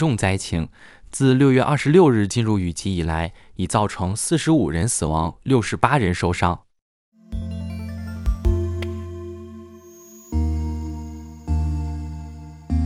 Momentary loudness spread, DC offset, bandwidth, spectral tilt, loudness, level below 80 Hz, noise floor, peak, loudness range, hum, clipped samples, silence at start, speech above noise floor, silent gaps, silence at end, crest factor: 18 LU; under 0.1%; 15.5 kHz; -6 dB/octave; -21 LUFS; -32 dBFS; -44 dBFS; 0 dBFS; 10 LU; none; under 0.1%; 0 s; 25 dB; 6.82-7.12 s; 0 s; 20 dB